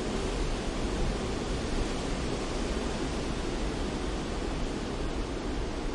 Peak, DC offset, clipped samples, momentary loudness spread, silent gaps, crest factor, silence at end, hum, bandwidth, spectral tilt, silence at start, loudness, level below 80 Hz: -18 dBFS; under 0.1%; under 0.1%; 2 LU; none; 14 dB; 0 s; none; 11.5 kHz; -5 dB/octave; 0 s; -33 LUFS; -36 dBFS